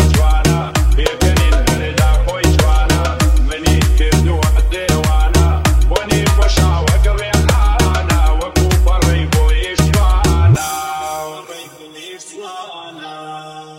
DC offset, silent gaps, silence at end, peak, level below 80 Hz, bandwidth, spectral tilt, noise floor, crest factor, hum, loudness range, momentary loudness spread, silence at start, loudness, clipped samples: under 0.1%; none; 0 s; 0 dBFS; -14 dBFS; 16 kHz; -5 dB/octave; -34 dBFS; 12 dB; none; 3 LU; 17 LU; 0 s; -14 LUFS; under 0.1%